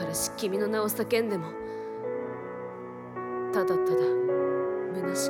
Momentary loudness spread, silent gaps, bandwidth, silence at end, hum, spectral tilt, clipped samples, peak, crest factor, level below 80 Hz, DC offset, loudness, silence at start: 12 LU; none; 18 kHz; 0 s; none; -4.5 dB/octave; under 0.1%; -14 dBFS; 14 dB; -66 dBFS; under 0.1%; -29 LUFS; 0 s